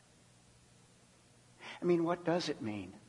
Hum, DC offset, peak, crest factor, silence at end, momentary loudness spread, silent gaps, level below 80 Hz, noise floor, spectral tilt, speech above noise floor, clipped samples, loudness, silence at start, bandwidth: none; under 0.1%; -18 dBFS; 20 dB; 0.1 s; 16 LU; none; -76 dBFS; -64 dBFS; -6 dB/octave; 30 dB; under 0.1%; -35 LUFS; 1.6 s; 11.5 kHz